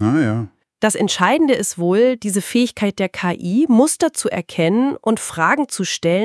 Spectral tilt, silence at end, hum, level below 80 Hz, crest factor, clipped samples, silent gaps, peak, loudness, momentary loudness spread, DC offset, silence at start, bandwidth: -4.5 dB/octave; 0 s; none; -62 dBFS; 18 dB; under 0.1%; none; 0 dBFS; -17 LUFS; 7 LU; under 0.1%; 0 s; 12 kHz